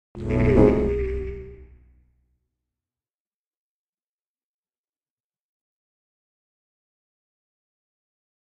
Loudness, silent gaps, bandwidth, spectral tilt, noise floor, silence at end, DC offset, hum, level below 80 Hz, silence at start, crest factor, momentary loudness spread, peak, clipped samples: -21 LUFS; none; 8.4 kHz; -9.5 dB/octave; under -90 dBFS; 6.85 s; under 0.1%; none; -36 dBFS; 0.15 s; 24 dB; 17 LU; -4 dBFS; under 0.1%